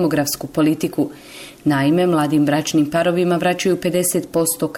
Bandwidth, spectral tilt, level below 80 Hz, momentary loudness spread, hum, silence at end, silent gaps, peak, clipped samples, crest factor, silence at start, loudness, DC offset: 17 kHz; -5 dB/octave; -54 dBFS; 7 LU; none; 0 s; none; -8 dBFS; under 0.1%; 10 dB; 0 s; -18 LUFS; under 0.1%